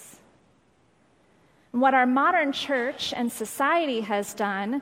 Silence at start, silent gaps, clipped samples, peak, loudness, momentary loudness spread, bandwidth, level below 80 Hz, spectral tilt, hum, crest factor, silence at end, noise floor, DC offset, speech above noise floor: 0 s; none; under 0.1%; -8 dBFS; -24 LUFS; 9 LU; 16 kHz; -70 dBFS; -3.5 dB/octave; none; 18 dB; 0 s; -63 dBFS; under 0.1%; 39 dB